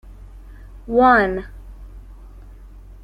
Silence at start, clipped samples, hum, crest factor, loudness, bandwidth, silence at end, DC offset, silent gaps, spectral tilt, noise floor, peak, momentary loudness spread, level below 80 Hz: 0.05 s; under 0.1%; none; 20 dB; -16 LUFS; 11.5 kHz; 0.25 s; under 0.1%; none; -7.5 dB/octave; -40 dBFS; -2 dBFS; 26 LU; -38 dBFS